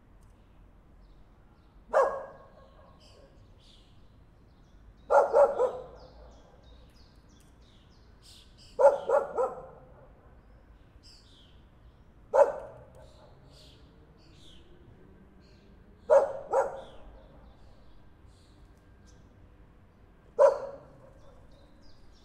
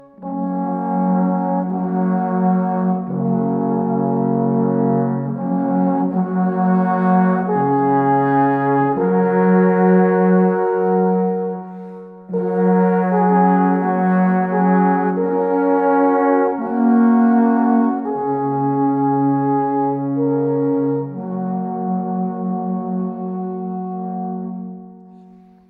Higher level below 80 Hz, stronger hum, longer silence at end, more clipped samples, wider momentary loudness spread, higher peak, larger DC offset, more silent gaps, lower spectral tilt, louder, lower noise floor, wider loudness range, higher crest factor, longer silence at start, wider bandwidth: first, -58 dBFS vs -64 dBFS; neither; second, 0.3 s vs 0.6 s; neither; first, 27 LU vs 11 LU; second, -8 dBFS vs -2 dBFS; neither; neither; second, -5 dB/octave vs -12 dB/octave; second, -26 LUFS vs -17 LUFS; first, -57 dBFS vs -45 dBFS; about the same, 6 LU vs 6 LU; first, 24 dB vs 14 dB; first, 1.9 s vs 0.2 s; first, 9.2 kHz vs 3 kHz